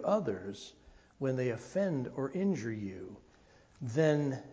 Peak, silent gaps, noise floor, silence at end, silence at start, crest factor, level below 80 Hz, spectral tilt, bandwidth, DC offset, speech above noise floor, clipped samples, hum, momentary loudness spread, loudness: -16 dBFS; none; -62 dBFS; 0 s; 0 s; 18 dB; -66 dBFS; -7 dB/octave; 8 kHz; under 0.1%; 29 dB; under 0.1%; none; 17 LU; -34 LUFS